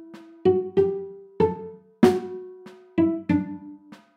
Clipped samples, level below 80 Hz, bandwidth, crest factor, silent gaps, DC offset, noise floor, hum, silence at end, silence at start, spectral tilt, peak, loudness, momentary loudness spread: under 0.1%; -58 dBFS; 13 kHz; 22 dB; none; under 0.1%; -45 dBFS; none; 0.2 s; 0 s; -8 dB/octave; -2 dBFS; -24 LUFS; 20 LU